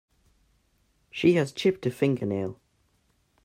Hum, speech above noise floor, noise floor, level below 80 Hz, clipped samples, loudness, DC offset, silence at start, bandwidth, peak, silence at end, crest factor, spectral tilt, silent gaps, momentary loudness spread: none; 44 dB; -69 dBFS; -66 dBFS; under 0.1%; -26 LUFS; under 0.1%; 1.15 s; 15.5 kHz; -8 dBFS; 0.9 s; 20 dB; -6.5 dB/octave; none; 11 LU